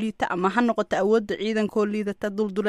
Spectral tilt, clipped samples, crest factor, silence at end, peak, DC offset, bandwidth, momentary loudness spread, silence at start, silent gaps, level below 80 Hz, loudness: -6 dB/octave; under 0.1%; 16 dB; 0 s; -8 dBFS; under 0.1%; 12 kHz; 5 LU; 0 s; none; -60 dBFS; -24 LUFS